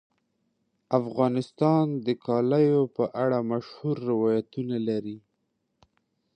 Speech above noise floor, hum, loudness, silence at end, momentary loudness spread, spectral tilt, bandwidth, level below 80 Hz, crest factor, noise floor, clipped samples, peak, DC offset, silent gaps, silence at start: 51 dB; none; -26 LUFS; 1.2 s; 9 LU; -9 dB/octave; 9.2 kHz; -72 dBFS; 20 dB; -76 dBFS; under 0.1%; -8 dBFS; under 0.1%; none; 0.9 s